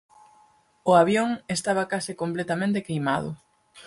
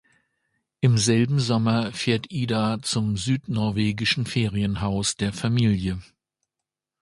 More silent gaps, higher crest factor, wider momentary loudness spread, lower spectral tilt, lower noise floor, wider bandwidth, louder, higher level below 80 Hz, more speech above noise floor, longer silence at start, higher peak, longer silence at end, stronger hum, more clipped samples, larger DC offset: neither; about the same, 20 dB vs 18 dB; first, 11 LU vs 5 LU; about the same, -5 dB/octave vs -5 dB/octave; second, -60 dBFS vs -87 dBFS; about the same, 12 kHz vs 11.5 kHz; about the same, -24 LUFS vs -23 LUFS; second, -62 dBFS vs -48 dBFS; second, 36 dB vs 64 dB; about the same, 0.85 s vs 0.8 s; about the same, -6 dBFS vs -6 dBFS; second, 0.05 s vs 1 s; neither; neither; neither